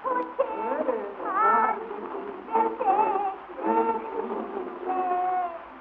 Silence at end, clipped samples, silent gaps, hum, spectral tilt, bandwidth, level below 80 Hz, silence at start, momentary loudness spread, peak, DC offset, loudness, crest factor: 0 s; under 0.1%; none; none; -3.5 dB/octave; 4.5 kHz; -66 dBFS; 0 s; 11 LU; -10 dBFS; under 0.1%; -27 LUFS; 16 dB